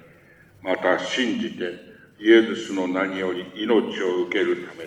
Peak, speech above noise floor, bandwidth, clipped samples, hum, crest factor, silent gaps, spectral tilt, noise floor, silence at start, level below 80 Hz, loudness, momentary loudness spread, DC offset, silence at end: -4 dBFS; 30 dB; 8.8 kHz; under 0.1%; none; 18 dB; none; -4.5 dB/octave; -52 dBFS; 0.65 s; -68 dBFS; -23 LUFS; 12 LU; under 0.1%; 0 s